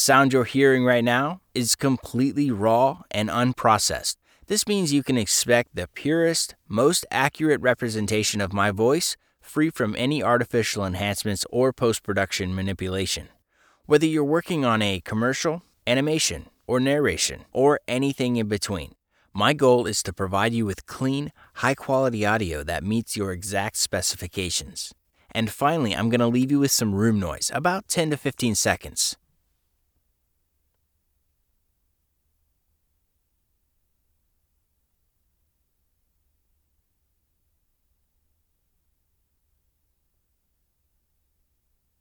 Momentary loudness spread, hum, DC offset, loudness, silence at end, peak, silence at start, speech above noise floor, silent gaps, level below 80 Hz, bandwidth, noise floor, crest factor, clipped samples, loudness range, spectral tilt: 8 LU; none; under 0.1%; -23 LUFS; 12.85 s; -4 dBFS; 0 s; 50 dB; none; -52 dBFS; over 20 kHz; -72 dBFS; 22 dB; under 0.1%; 4 LU; -4 dB/octave